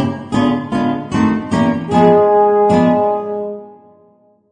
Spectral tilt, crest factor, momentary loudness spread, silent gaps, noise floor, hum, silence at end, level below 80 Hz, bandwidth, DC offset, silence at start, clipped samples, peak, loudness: -7.5 dB/octave; 14 dB; 11 LU; none; -51 dBFS; none; 0.8 s; -48 dBFS; 9.8 kHz; under 0.1%; 0 s; under 0.1%; 0 dBFS; -14 LUFS